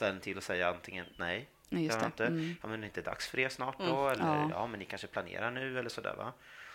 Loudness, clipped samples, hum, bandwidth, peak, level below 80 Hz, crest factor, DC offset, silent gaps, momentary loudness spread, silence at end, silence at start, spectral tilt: -36 LUFS; under 0.1%; none; 16.5 kHz; -16 dBFS; -68 dBFS; 20 dB; under 0.1%; none; 9 LU; 0 s; 0 s; -5 dB/octave